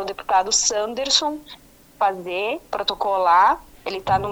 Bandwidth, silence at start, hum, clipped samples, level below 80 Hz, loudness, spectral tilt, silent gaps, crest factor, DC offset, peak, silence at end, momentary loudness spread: over 20 kHz; 0 s; none; under 0.1%; -50 dBFS; -20 LUFS; -1.5 dB/octave; none; 20 dB; under 0.1%; -2 dBFS; 0 s; 11 LU